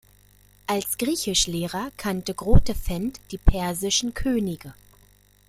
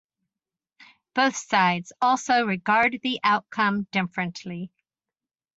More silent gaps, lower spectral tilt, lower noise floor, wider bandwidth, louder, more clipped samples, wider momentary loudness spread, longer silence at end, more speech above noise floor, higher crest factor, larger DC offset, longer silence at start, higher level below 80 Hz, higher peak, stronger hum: neither; about the same, -4 dB/octave vs -4 dB/octave; second, -57 dBFS vs under -90 dBFS; first, 16 kHz vs 8.2 kHz; about the same, -25 LUFS vs -23 LUFS; neither; about the same, 9 LU vs 11 LU; second, 0.75 s vs 0.9 s; second, 34 dB vs over 66 dB; about the same, 20 dB vs 18 dB; neither; second, 0.7 s vs 1.15 s; first, -30 dBFS vs -68 dBFS; first, -2 dBFS vs -6 dBFS; first, 50 Hz at -45 dBFS vs none